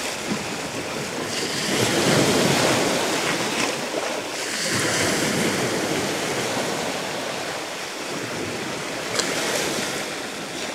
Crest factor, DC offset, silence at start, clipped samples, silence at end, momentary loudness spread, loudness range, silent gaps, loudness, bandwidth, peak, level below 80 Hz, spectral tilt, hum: 22 dB; under 0.1%; 0 s; under 0.1%; 0 s; 9 LU; 5 LU; none; -23 LUFS; 16 kHz; -4 dBFS; -56 dBFS; -3 dB/octave; none